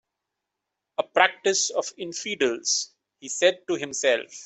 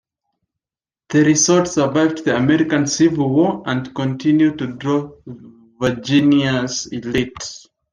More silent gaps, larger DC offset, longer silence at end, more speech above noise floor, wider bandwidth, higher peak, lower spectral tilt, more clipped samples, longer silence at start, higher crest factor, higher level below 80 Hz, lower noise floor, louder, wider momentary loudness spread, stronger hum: neither; neither; second, 0 s vs 0.35 s; second, 59 dB vs over 73 dB; second, 8.4 kHz vs 10 kHz; about the same, -4 dBFS vs -2 dBFS; second, -1 dB/octave vs -4.5 dB/octave; neither; about the same, 1 s vs 1.1 s; first, 22 dB vs 16 dB; second, -76 dBFS vs -52 dBFS; second, -84 dBFS vs under -90 dBFS; second, -24 LUFS vs -17 LUFS; about the same, 12 LU vs 10 LU; neither